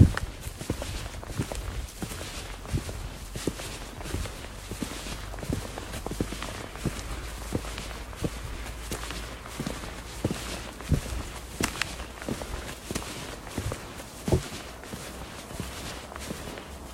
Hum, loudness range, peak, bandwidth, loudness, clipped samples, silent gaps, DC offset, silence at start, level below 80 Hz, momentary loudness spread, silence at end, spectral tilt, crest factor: none; 3 LU; -4 dBFS; 16 kHz; -35 LUFS; under 0.1%; none; under 0.1%; 0 s; -40 dBFS; 8 LU; 0 s; -4.5 dB/octave; 30 dB